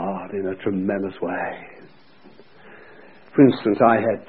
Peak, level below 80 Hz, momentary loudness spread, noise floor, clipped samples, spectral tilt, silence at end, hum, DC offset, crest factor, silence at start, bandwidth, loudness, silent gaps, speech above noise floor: -2 dBFS; -60 dBFS; 12 LU; -51 dBFS; under 0.1%; -12 dB/octave; 0.05 s; none; 0.3%; 20 dB; 0 s; 4.7 kHz; -21 LUFS; none; 31 dB